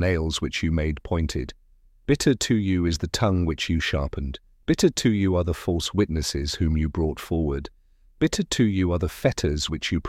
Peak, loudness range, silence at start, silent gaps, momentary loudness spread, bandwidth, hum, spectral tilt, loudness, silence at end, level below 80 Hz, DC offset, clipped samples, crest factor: -6 dBFS; 2 LU; 0 s; none; 7 LU; 15.5 kHz; none; -5.5 dB/octave; -24 LUFS; 0 s; -34 dBFS; under 0.1%; under 0.1%; 18 dB